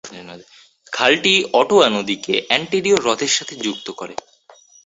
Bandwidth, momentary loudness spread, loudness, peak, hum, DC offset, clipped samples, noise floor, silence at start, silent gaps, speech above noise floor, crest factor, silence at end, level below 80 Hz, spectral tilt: 8 kHz; 18 LU; -16 LUFS; 0 dBFS; none; under 0.1%; under 0.1%; -49 dBFS; 0.05 s; none; 30 dB; 20 dB; 0.7 s; -60 dBFS; -2.5 dB/octave